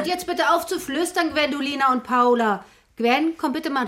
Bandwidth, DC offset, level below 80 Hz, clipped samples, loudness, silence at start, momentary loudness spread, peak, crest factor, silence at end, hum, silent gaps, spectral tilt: 16.5 kHz; under 0.1%; -60 dBFS; under 0.1%; -21 LUFS; 0 s; 6 LU; -6 dBFS; 16 dB; 0 s; none; none; -3 dB/octave